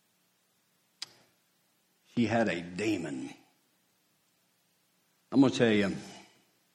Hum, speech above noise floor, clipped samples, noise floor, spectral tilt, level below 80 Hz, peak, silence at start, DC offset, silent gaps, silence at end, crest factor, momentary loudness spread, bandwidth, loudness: none; 44 dB; under 0.1%; -73 dBFS; -5.5 dB/octave; -72 dBFS; -12 dBFS; 2.15 s; under 0.1%; none; 0.5 s; 22 dB; 20 LU; 12.5 kHz; -30 LUFS